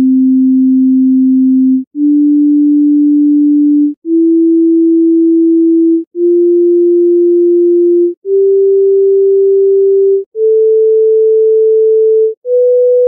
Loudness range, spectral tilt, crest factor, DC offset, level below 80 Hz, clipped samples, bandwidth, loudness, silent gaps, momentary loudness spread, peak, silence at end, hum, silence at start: 0 LU; -9 dB/octave; 4 dB; under 0.1%; -78 dBFS; under 0.1%; 0.6 kHz; -9 LUFS; 1.87-1.91 s, 3.97-4.02 s, 6.07-6.11 s, 8.17-8.22 s, 10.26-10.32 s, 12.37-12.42 s; 3 LU; -4 dBFS; 0 s; none; 0 s